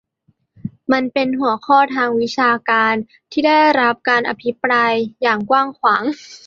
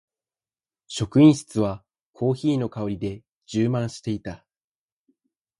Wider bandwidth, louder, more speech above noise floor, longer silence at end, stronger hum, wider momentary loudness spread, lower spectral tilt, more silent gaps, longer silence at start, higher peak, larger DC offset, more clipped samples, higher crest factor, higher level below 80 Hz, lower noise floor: second, 7.4 kHz vs 11.5 kHz; first, -16 LUFS vs -23 LUFS; second, 46 dB vs over 68 dB; second, 0.1 s vs 1.25 s; neither; second, 9 LU vs 17 LU; second, -5 dB/octave vs -7 dB/octave; second, none vs 2.06-2.13 s, 3.32-3.41 s; second, 0.65 s vs 0.9 s; about the same, -2 dBFS vs -4 dBFS; neither; neither; about the same, 16 dB vs 20 dB; second, -62 dBFS vs -54 dBFS; second, -62 dBFS vs under -90 dBFS